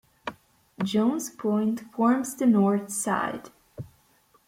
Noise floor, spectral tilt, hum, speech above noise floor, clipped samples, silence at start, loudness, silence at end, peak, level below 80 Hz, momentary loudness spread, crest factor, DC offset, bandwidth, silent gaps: -63 dBFS; -5.5 dB/octave; none; 38 dB; under 0.1%; 0.25 s; -25 LUFS; 0.65 s; -10 dBFS; -66 dBFS; 21 LU; 18 dB; under 0.1%; 16 kHz; none